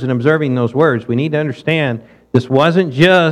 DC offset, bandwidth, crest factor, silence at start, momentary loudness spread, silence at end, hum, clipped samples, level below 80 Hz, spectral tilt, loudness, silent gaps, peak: under 0.1%; 11 kHz; 14 dB; 0 s; 7 LU; 0 s; none; under 0.1%; -52 dBFS; -7 dB/octave; -14 LUFS; none; 0 dBFS